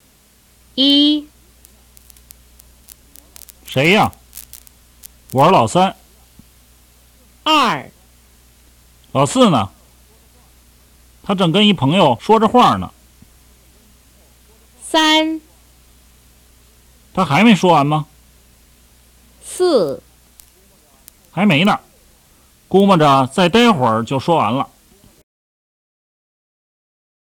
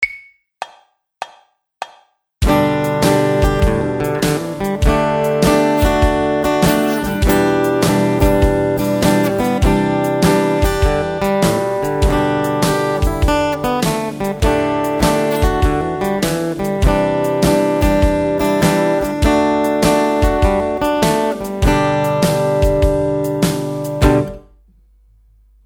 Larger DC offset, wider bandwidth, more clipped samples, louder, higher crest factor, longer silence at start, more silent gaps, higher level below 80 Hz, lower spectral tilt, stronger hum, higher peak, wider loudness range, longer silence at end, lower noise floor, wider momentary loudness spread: neither; second, 18 kHz vs over 20 kHz; neither; about the same, -14 LUFS vs -16 LUFS; about the same, 18 dB vs 16 dB; first, 0.75 s vs 0 s; neither; second, -50 dBFS vs -24 dBFS; about the same, -5 dB/octave vs -6 dB/octave; first, 60 Hz at -45 dBFS vs none; about the same, 0 dBFS vs 0 dBFS; first, 6 LU vs 2 LU; first, 2.55 s vs 1.25 s; about the same, -52 dBFS vs -52 dBFS; first, 17 LU vs 6 LU